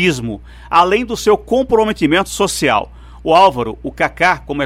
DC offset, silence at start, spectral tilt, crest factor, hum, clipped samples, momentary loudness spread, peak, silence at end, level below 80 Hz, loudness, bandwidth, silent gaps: under 0.1%; 0 s; -4 dB/octave; 14 dB; none; under 0.1%; 12 LU; -2 dBFS; 0 s; -38 dBFS; -14 LUFS; 16 kHz; none